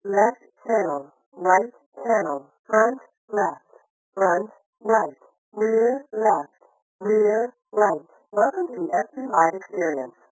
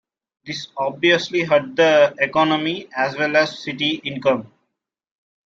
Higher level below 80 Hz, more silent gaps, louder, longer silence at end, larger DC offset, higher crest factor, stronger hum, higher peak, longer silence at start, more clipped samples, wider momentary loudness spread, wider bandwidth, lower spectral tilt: second, -82 dBFS vs -66 dBFS; first, 1.26-1.32 s, 1.86-1.92 s, 2.59-2.64 s, 3.17-3.28 s, 3.90-4.13 s, 4.66-4.73 s, 5.38-5.52 s, 6.82-6.99 s vs none; second, -23 LUFS vs -19 LUFS; second, 0.2 s vs 1 s; neither; about the same, 20 dB vs 18 dB; neither; about the same, -4 dBFS vs -2 dBFS; second, 0.05 s vs 0.45 s; neither; first, 13 LU vs 10 LU; about the same, 8 kHz vs 7.6 kHz; first, -8.5 dB/octave vs -4.5 dB/octave